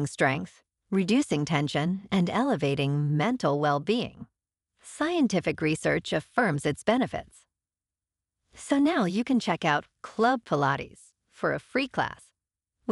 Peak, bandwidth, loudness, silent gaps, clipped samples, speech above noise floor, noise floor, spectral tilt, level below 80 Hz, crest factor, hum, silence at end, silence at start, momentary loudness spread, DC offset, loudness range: -10 dBFS; 11.5 kHz; -27 LUFS; none; under 0.1%; over 63 dB; under -90 dBFS; -6 dB/octave; -60 dBFS; 18 dB; none; 0 s; 0 s; 8 LU; under 0.1%; 2 LU